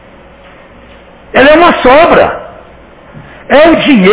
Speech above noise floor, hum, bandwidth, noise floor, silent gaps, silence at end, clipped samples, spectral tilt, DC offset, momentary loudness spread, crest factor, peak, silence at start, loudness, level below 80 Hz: 31 dB; none; 4 kHz; -35 dBFS; none; 0 s; 5%; -9 dB/octave; under 0.1%; 9 LU; 8 dB; 0 dBFS; 1.35 s; -5 LUFS; -34 dBFS